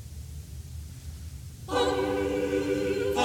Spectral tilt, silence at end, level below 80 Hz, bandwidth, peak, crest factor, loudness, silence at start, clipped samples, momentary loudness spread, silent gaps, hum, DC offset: -5 dB/octave; 0 s; -44 dBFS; 18 kHz; -14 dBFS; 16 dB; -28 LUFS; 0 s; under 0.1%; 15 LU; none; none; under 0.1%